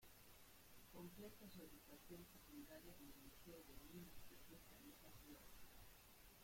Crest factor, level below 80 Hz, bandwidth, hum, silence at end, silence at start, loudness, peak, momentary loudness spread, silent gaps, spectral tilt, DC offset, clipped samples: 16 dB; -72 dBFS; 16.5 kHz; none; 0 s; 0 s; -63 LUFS; -46 dBFS; 6 LU; none; -4 dB/octave; under 0.1%; under 0.1%